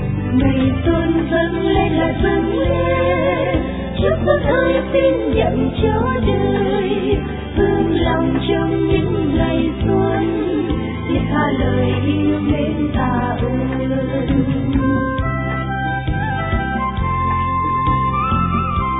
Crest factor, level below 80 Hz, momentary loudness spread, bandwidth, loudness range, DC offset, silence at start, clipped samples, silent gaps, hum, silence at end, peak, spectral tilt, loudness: 14 dB; -28 dBFS; 4 LU; 4 kHz; 2 LU; under 0.1%; 0 s; under 0.1%; none; none; 0 s; -2 dBFS; -11.5 dB/octave; -17 LUFS